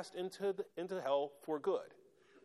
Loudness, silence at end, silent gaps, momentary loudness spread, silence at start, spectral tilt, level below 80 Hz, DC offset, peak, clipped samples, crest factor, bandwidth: -40 LUFS; 0.05 s; none; 7 LU; 0 s; -5.5 dB/octave; -88 dBFS; under 0.1%; -22 dBFS; under 0.1%; 18 dB; 13 kHz